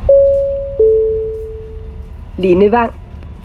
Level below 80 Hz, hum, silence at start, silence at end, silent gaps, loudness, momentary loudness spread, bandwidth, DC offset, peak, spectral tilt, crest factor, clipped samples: -30 dBFS; none; 0 s; 0 s; none; -13 LUFS; 21 LU; 4.7 kHz; under 0.1%; 0 dBFS; -9 dB/octave; 14 dB; under 0.1%